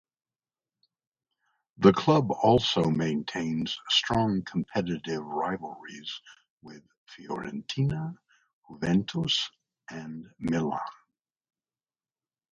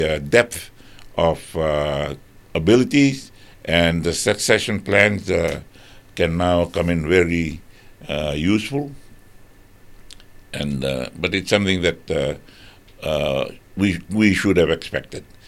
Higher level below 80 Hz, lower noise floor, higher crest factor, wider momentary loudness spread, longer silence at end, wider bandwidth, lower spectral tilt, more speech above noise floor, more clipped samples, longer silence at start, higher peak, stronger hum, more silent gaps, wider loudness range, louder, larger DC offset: second, -58 dBFS vs -40 dBFS; first, under -90 dBFS vs -46 dBFS; about the same, 24 dB vs 20 dB; about the same, 17 LU vs 15 LU; first, 1.6 s vs 0.25 s; second, 9.4 kHz vs 16.5 kHz; about the same, -5.5 dB/octave vs -5 dB/octave; first, over 62 dB vs 26 dB; neither; first, 1.8 s vs 0 s; second, -6 dBFS vs 0 dBFS; neither; first, 6.50-6.57 s, 6.98-7.06 s, 8.53-8.63 s vs none; first, 10 LU vs 7 LU; second, -27 LUFS vs -20 LUFS; neither